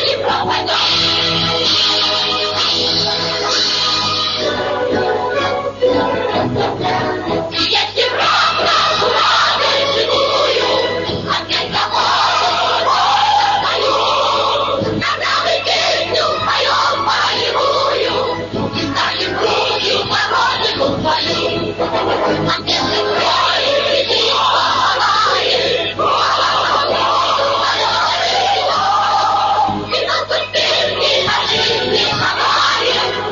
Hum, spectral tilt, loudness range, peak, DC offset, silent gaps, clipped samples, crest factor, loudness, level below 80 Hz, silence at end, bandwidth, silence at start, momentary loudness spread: 50 Hz at -35 dBFS; -3 dB/octave; 2 LU; -4 dBFS; under 0.1%; none; under 0.1%; 12 dB; -14 LUFS; -46 dBFS; 0 s; 7.4 kHz; 0 s; 5 LU